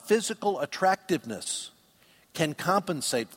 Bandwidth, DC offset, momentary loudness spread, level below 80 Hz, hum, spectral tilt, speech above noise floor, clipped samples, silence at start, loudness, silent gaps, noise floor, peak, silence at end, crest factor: 16.5 kHz; under 0.1%; 8 LU; -70 dBFS; none; -3.5 dB/octave; 33 dB; under 0.1%; 0.05 s; -28 LUFS; none; -61 dBFS; -10 dBFS; 0 s; 20 dB